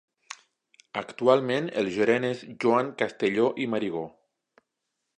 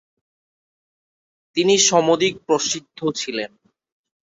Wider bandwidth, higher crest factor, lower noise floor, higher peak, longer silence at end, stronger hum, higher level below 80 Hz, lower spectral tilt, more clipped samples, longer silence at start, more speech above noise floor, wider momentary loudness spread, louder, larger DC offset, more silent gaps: first, 9.8 kHz vs 8 kHz; about the same, 22 dB vs 20 dB; second, -82 dBFS vs under -90 dBFS; second, -6 dBFS vs -2 dBFS; first, 1.1 s vs 0.85 s; neither; second, -72 dBFS vs -64 dBFS; first, -6 dB/octave vs -2.5 dB/octave; neither; second, 0.3 s vs 1.55 s; second, 56 dB vs over 71 dB; first, 19 LU vs 13 LU; second, -26 LUFS vs -19 LUFS; neither; neither